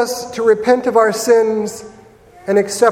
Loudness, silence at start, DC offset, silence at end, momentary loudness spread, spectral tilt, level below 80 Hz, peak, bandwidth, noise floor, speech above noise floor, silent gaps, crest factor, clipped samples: -15 LUFS; 0 s; under 0.1%; 0 s; 12 LU; -4 dB/octave; -56 dBFS; 0 dBFS; 16.5 kHz; -42 dBFS; 28 dB; none; 16 dB; under 0.1%